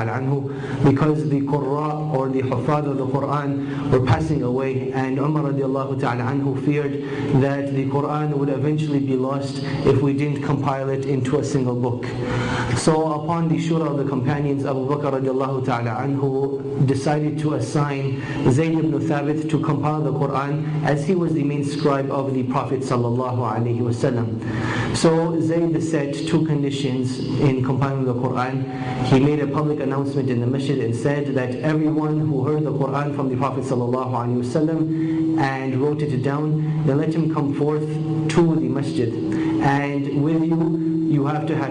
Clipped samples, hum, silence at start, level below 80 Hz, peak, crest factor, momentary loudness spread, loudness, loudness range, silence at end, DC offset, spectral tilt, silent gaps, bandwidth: under 0.1%; none; 0 s; -48 dBFS; -6 dBFS; 14 dB; 4 LU; -21 LUFS; 1 LU; 0 s; under 0.1%; -7.5 dB/octave; none; 10.5 kHz